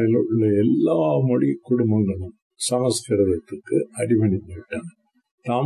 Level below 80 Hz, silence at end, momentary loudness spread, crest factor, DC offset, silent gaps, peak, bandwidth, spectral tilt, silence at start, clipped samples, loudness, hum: -48 dBFS; 0 s; 14 LU; 12 dB; under 0.1%; 2.42-2.50 s, 5.31-5.38 s; -8 dBFS; 12.5 kHz; -6.5 dB/octave; 0 s; under 0.1%; -21 LUFS; none